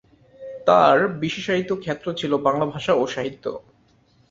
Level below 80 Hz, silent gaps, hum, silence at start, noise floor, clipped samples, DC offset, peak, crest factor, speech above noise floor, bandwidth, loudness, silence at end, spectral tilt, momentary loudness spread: -60 dBFS; none; none; 0.4 s; -59 dBFS; under 0.1%; under 0.1%; -2 dBFS; 20 dB; 38 dB; 7.8 kHz; -21 LUFS; 0.7 s; -5.5 dB/octave; 16 LU